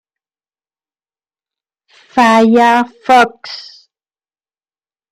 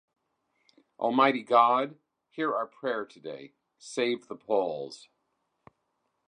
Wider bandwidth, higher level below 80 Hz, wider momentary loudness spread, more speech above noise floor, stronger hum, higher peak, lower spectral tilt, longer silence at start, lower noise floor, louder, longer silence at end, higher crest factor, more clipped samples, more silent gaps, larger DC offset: first, 15 kHz vs 10.5 kHz; first, -60 dBFS vs -84 dBFS; about the same, 19 LU vs 20 LU; first, over 80 dB vs 50 dB; neither; first, 0 dBFS vs -8 dBFS; about the same, -4.5 dB/octave vs -4.5 dB/octave; first, 2.15 s vs 1 s; first, under -90 dBFS vs -78 dBFS; first, -10 LUFS vs -28 LUFS; first, 1.5 s vs 1.35 s; second, 16 dB vs 24 dB; neither; neither; neither